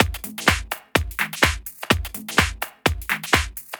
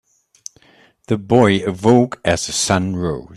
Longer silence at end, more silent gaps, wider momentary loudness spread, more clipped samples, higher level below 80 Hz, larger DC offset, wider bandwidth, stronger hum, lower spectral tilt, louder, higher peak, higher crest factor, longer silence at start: about the same, 0 s vs 0 s; neither; second, 5 LU vs 23 LU; neither; first, -34 dBFS vs -48 dBFS; neither; first, over 20 kHz vs 13.5 kHz; neither; second, -3.5 dB/octave vs -5 dB/octave; second, -22 LUFS vs -16 LUFS; about the same, -2 dBFS vs 0 dBFS; about the same, 22 dB vs 18 dB; second, 0 s vs 1.1 s